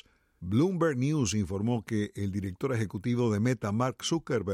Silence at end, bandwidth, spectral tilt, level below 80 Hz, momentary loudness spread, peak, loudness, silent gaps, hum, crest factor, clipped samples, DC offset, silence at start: 0 s; 14.5 kHz; -6 dB/octave; -58 dBFS; 6 LU; -16 dBFS; -30 LUFS; none; none; 14 dB; under 0.1%; under 0.1%; 0.4 s